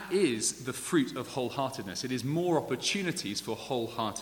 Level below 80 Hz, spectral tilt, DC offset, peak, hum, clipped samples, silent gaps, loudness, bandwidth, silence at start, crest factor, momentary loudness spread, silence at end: -66 dBFS; -4 dB/octave; under 0.1%; -14 dBFS; none; under 0.1%; none; -31 LUFS; 19.5 kHz; 0 s; 18 dB; 6 LU; 0 s